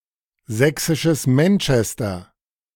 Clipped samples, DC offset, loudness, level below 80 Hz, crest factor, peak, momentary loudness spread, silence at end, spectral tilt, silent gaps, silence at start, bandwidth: under 0.1%; under 0.1%; -19 LUFS; -46 dBFS; 18 dB; -2 dBFS; 11 LU; 0.55 s; -5.5 dB/octave; none; 0.5 s; 18 kHz